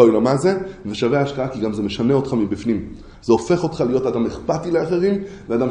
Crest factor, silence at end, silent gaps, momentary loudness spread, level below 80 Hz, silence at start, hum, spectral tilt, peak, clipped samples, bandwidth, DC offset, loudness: 18 dB; 0 s; none; 8 LU; -44 dBFS; 0 s; none; -7 dB/octave; 0 dBFS; under 0.1%; 10.5 kHz; under 0.1%; -20 LUFS